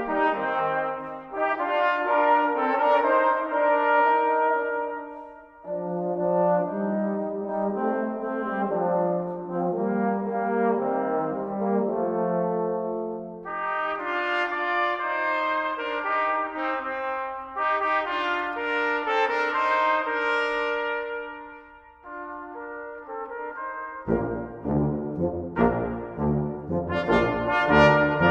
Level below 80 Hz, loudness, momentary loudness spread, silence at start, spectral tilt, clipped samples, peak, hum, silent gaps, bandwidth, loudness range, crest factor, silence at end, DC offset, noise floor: -52 dBFS; -25 LUFS; 13 LU; 0 s; -7.5 dB/octave; under 0.1%; -4 dBFS; none; none; 8 kHz; 7 LU; 22 dB; 0 s; under 0.1%; -48 dBFS